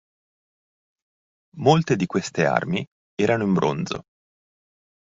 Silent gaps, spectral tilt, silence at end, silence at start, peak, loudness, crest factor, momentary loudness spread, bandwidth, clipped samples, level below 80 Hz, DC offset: 2.87-3.17 s; -6 dB/octave; 1 s; 1.55 s; -2 dBFS; -22 LUFS; 22 dB; 10 LU; 7.8 kHz; under 0.1%; -58 dBFS; under 0.1%